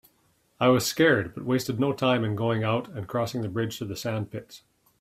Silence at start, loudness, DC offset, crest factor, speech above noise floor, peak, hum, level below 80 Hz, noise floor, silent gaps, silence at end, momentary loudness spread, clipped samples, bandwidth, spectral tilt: 0.6 s; -26 LUFS; under 0.1%; 20 dB; 41 dB; -8 dBFS; none; -62 dBFS; -67 dBFS; none; 0.45 s; 10 LU; under 0.1%; 16 kHz; -5.5 dB/octave